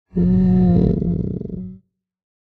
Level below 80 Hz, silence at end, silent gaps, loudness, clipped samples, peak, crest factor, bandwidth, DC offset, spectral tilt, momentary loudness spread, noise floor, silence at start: -32 dBFS; 0.65 s; none; -18 LUFS; under 0.1%; -4 dBFS; 14 dB; 4.3 kHz; under 0.1%; -12.5 dB/octave; 16 LU; -51 dBFS; 0.15 s